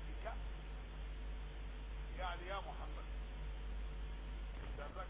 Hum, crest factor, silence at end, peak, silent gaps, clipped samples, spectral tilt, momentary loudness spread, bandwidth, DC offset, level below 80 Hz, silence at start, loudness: none; 16 dB; 0 s; -30 dBFS; none; under 0.1%; -4.5 dB/octave; 5 LU; 4 kHz; under 0.1%; -46 dBFS; 0 s; -49 LUFS